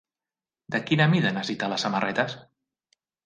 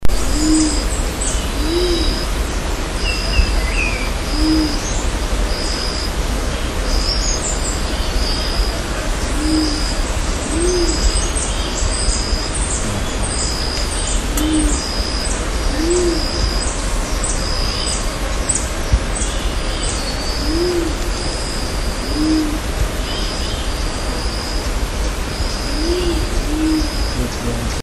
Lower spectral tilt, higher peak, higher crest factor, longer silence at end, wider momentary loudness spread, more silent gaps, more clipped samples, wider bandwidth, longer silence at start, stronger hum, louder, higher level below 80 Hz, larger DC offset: first, -5.5 dB/octave vs -3.5 dB/octave; second, -8 dBFS vs -2 dBFS; about the same, 20 dB vs 16 dB; first, 0.8 s vs 0 s; first, 10 LU vs 5 LU; neither; neither; second, 9.2 kHz vs 13.5 kHz; first, 0.7 s vs 0 s; neither; second, -25 LUFS vs -19 LUFS; second, -68 dBFS vs -20 dBFS; neither